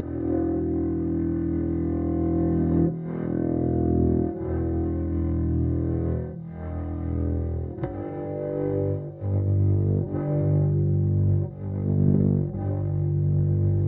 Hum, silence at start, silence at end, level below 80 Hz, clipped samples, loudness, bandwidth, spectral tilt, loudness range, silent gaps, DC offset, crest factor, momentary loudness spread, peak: none; 0 s; 0 s; -38 dBFS; under 0.1%; -25 LUFS; 2.4 kHz; -13.5 dB/octave; 5 LU; none; under 0.1%; 16 dB; 8 LU; -8 dBFS